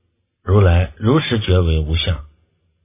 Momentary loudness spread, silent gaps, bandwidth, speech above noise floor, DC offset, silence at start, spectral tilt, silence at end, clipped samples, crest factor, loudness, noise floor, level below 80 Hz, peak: 8 LU; none; 3.9 kHz; 46 dB; under 0.1%; 0.45 s; -11 dB/octave; 0.6 s; under 0.1%; 16 dB; -17 LUFS; -61 dBFS; -24 dBFS; -2 dBFS